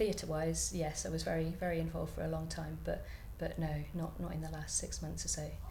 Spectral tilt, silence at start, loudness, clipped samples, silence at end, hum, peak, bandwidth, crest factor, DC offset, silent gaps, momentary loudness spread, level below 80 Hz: -4.5 dB/octave; 0 s; -39 LUFS; under 0.1%; 0 s; none; -22 dBFS; 18 kHz; 16 dB; under 0.1%; none; 7 LU; -48 dBFS